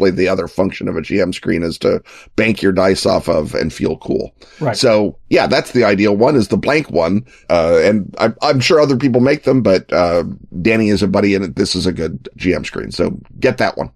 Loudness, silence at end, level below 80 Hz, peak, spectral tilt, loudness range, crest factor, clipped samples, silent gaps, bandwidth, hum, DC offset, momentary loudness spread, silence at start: -15 LUFS; 0.1 s; -42 dBFS; 0 dBFS; -5.5 dB/octave; 3 LU; 14 dB; under 0.1%; none; 13.5 kHz; none; under 0.1%; 8 LU; 0 s